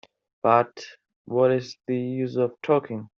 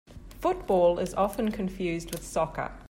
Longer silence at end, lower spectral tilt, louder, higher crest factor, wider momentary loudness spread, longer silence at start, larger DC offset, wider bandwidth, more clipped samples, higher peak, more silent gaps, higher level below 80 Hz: first, 0.15 s vs 0 s; about the same, -6 dB/octave vs -6 dB/octave; first, -24 LUFS vs -28 LUFS; about the same, 20 dB vs 16 dB; first, 12 LU vs 8 LU; first, 0.45 s vs 0.1 s; neither; second, 7.2 kHz vs 16.5 kHz; neither; first, -4 dBFS vs -12 dBFS; first, 1.16-1.25 s vs none; second, -70 dBFS vs -46 dBFS